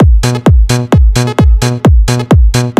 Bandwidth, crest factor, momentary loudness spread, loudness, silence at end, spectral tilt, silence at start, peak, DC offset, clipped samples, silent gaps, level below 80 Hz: 13.5 kHz; 6 dB; 1 LU; -9 LUFS; 0.1 s; -6 dB/octave; 0 s; 0 dBFS; under 0.1%; under 0.1%; none; -10 dBFS